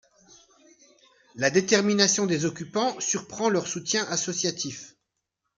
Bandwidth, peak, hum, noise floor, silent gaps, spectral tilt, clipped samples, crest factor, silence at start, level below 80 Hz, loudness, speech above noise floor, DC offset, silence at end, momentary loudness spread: 10 kHz; -4 dBFS; none; -81 dBFS; none; -3 dB/octave; under 0.1%; 24 dB; 1.35 s; -70 dBFS; -25 LUFS; 56 dB; under 0.1%; 0.7 s; 8 LU